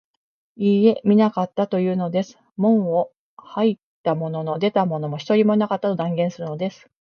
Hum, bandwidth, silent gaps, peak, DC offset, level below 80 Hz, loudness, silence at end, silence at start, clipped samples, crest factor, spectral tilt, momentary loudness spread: none; 6.8 kHz; 2.52-2.56 s, 3.17-3.37 s, 3.83-4.04 s; -4 dBFS; under 0.1%; -68 dBFS; -21 LUFS; 0.3 s; 0.6 s; under 0.1%; 18 dB; -8 dB/octave; 10 LU